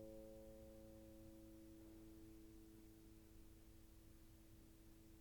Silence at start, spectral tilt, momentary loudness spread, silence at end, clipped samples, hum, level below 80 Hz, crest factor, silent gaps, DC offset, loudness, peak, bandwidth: 0 s; -6 dB/octave; 6 LU; 0 s; under 0.1%; none; -68 dBFS; 14 dB; none; under 0.1%; -64 LUFS; -48 dBFS; 19 kHz